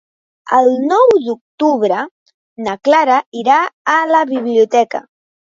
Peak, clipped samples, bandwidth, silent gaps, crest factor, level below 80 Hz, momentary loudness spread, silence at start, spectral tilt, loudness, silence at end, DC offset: 0 dBFS; under 0.1%; 7.8 kHz; 1.41-1.58 s, 2.11-2.26 s, 2.34-2.56 s, 3.26-3.32 s, 3.73-3.85 s; 14 dB; -64 dBFS; 11 LU; 0.45 s; -4.5 dB/octave; -14 LUFS; 0.5 s; under 0.1%